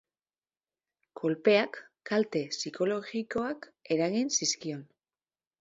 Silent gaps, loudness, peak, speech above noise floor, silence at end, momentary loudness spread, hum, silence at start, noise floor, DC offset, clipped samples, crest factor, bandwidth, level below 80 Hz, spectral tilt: none; -30 LUFS; -12 dBFS; over 60 dB; 0.75 s; 12 LU; none; 1.15 s; under -90 dBFS; under 0.1%; under 0.1%; 20 dB; 7.8 kHz; -74 dBFS; -3.5 dB/octave